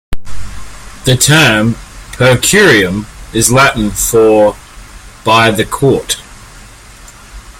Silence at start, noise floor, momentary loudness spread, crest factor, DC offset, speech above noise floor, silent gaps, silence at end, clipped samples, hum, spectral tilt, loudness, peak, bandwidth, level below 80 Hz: 0.1 s; -35 dBFS; 23 LU; 12 dB; under 0.1%; 26 dB; none; 0.1 s; under 0.1%; none; -3.5 dB/octave; -9 LUFS; 0 dBFS; over 20 kHz; -30 dBFS